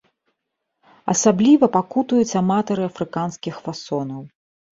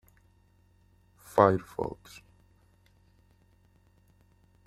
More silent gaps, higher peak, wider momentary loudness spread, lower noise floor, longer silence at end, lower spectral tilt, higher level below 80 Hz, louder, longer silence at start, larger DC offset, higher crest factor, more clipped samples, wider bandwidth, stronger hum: neither; first, -2 dBFS vs -6 dBFS; second, 16 LU vs 27 LU; first, -78 dBFS vs -64 dBFS; second, 0.5 s vs 2.75 s; second, -5.5 dB/octave vs -7.5 dB/octave; about the same, -62 dBFS vs -62 dBFS; first, -19 LUFS vs -27 LUFS; second, 1.05 s vs 1.35 s; neither; second, 18 dB vs 28 dB; neither; second, 7.8 kHz vs 15 kHz; neither